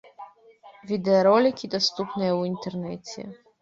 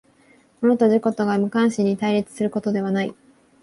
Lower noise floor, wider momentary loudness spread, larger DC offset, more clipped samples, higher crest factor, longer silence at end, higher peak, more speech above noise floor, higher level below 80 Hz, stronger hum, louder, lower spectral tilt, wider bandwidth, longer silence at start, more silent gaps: second, -52 dBFS vs -56 dBFS; first, 18 LU vs 7 LU; neither; neither; about the same, 18 dB vs 14 dB; second, 0.3 s vs 0.5 s; about the same, -6 dBFS vs -6 dBFS; second, 27 dB vs 36 dB; about the same, -68 dBFS vs -64 dBFS; neither; second, -24 LUFS vs -21 LUFS; second, -5.5 dB/octave vs -7 dB/octave; second, 7.8 kHz vs 11.5 kHz; second, 0.2 s vs 0.6 s; neither